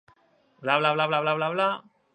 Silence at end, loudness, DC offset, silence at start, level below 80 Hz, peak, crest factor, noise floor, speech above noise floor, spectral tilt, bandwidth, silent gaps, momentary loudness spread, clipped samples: 0.35 s; -25 LUFS; under 0.1%; 0.6 s; -78 dBFS; -6 dBFS; 20 dB; -63 dBFS; 39 dB; -6 dB/octave; 9.2 kHz; none; 9 LU; under 0.1%